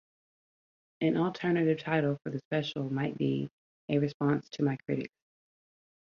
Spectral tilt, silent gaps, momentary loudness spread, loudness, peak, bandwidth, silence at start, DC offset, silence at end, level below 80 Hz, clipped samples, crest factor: -8 dB/octave; 2.45-2.51 s, 3.53-3.88 s, 4.14-4.20 s; 7 LU; -31 LUFS; -14 dBFS; 7 kHz; 1 s; under 0.1%; 1.05 s; -72 dBFS; under 0.1%; 18 dB